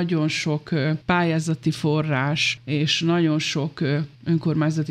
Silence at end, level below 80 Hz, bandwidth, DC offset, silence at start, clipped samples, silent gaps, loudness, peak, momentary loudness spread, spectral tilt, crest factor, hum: 0 s; -58 dBFS; 10.5 kHz; under 0.1%; 0 s; under 0.1%; none; -22 LUFS; -6 dBFS; 4 LU; -5.5 dB/octave; 16 dB; none